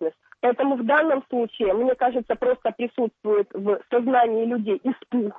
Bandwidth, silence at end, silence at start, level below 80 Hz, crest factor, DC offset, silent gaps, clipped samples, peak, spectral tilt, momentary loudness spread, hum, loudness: 3.9 kHz; 0 s; 0 s; -62 dBFS; 14 dB; under 0.1%; none; under 0.1%; -10 dBFS; -8.5 dB/octave; 6 LU; none; -23 LUFS